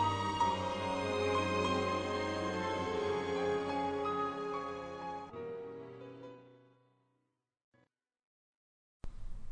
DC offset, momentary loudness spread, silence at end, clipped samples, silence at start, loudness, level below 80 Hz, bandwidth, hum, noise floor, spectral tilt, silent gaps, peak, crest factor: under 0.1%; 17 LU; 0 s; under 0.1%; 0 s; -36 LUFS; -56 dBFS; 10 kHz; none; -83 dBFS; -5 dB/octave; 7.64-7.72 s, 8.25-9.00 s; -22 dBFS; 16 dB